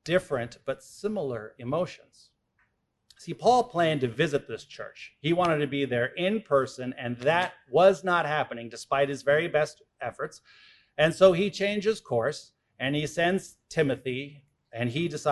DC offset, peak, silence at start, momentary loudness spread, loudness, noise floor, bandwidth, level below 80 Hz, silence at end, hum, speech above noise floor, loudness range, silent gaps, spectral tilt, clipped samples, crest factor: under 0.1%; -6 dBFS; 0.05 s; 16 LU; -27 LUFS; -73 dBFS; 12 kHz; -62 dBFS; 0 s; none; 46 dB; 4 LU; none; -5.5 dB/octave; under 0.1%; 20 dB